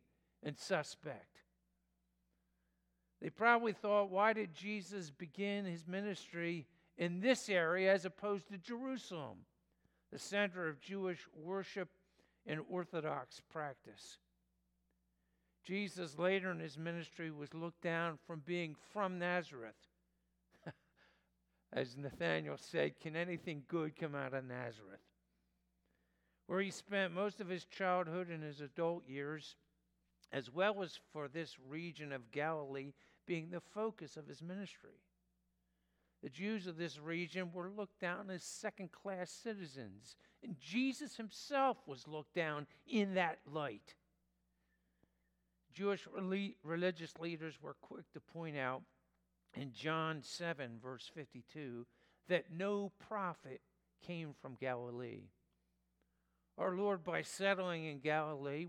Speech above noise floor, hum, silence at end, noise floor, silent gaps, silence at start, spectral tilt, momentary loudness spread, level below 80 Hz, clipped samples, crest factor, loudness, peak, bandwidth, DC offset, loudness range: 41 dB; none; 0 s; -83 dBFS; none; 0.45 s; -5 dB/octave; 16 LU; -84 dBFS; under 0.1%; 26 dB; -42 LUFS; -16 dBFS; 15.5 kHz; under 0.1%; 9 LU